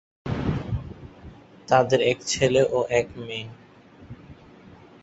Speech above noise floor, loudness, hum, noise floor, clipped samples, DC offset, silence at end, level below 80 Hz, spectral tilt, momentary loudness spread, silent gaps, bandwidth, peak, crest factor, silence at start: 26 dB; -24 LUFS; none; -48 dBFS; under 0.1%; under 0.1%; 0.35 s; -46 dBFS; -4.5 dB/octave; 25 LU; none; 8.2 kHz; -4 dBFS; 22 dB; 0.25 s